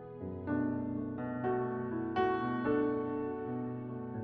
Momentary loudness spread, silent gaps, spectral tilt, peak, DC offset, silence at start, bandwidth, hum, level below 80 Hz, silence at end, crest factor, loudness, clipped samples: 8 LU; none; -10 dB/octave; -18 dBFS; under 0.1%; 0 s; 5.4 kHz; none; -64 dBFS; 0 s; 16 dB; -36 LUFS; under 0.1%